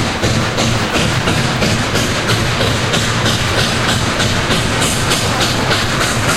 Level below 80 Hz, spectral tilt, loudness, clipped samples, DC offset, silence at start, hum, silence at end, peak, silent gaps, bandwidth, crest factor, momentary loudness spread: -30 dBFS; -3.5 dB/octave; -14 LUFS; under 0.1%; under 0.1%; 0 s; none; 0 s; 0 dBFS; none; 16.5 kHz; 14 dB; 1 LU